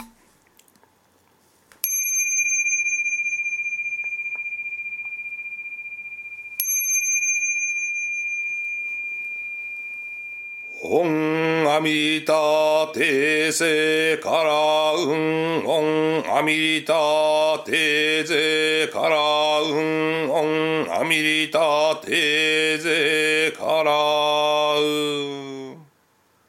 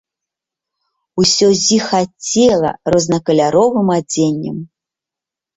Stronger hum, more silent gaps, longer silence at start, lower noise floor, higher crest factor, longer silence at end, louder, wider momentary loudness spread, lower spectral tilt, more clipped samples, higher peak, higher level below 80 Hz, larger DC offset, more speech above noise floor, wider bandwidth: neither; neither; second, 0 s vs 1.15 s; second, -62 dBFS vs -86 dBFS; first, 20 dB vs 14 dB; second, 0.65 s vs 0.9 s; second, -20 LUFS vs -14 LUFS; first, 12 LU vs 8 LU; second, -2 dB/octave vs -4 dB/octave; neither; about the same, -2 dBFS vs -2 dBFS; second, -76 dBFS vs -50 dBFS; neither; second, 42 dB vs 73 dB; first, 16.5 kHz vs 8.2 kHz